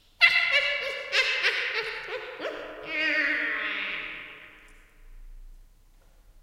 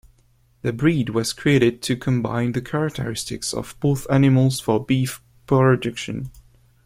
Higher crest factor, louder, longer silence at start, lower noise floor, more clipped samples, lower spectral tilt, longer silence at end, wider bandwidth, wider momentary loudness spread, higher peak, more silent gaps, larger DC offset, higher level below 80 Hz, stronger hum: first, 26 dB vs 18 dB; second, -25 LUFS vs -21 LUFS; second, 0.2 s vs 0.65 s; about the same, -56 dBFS vs -58 dBFS; neither; second, -1 dB/octave vs -6 dB/octave; second, 0.05 s vs 0.45 s; about the same, 16 kHz vs 16 kHz; first, 17 LU vs 11 LU; about the same, -4 dBFS vs -4 dBFS; neither; neither; second, -54 dBFS vs -48 dBFS; neither